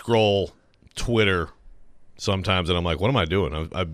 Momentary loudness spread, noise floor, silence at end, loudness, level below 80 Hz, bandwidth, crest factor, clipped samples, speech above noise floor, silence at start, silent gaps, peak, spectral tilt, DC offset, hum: 12 LU; -45 dBFS; 0 s; -23 LUFS; -42 dBFS; 14 kHz; 16 dB; under 0.1%; 23 dB; 0 s; none; -8 dBFS; -5.5 dB/octave; under 0.1%; none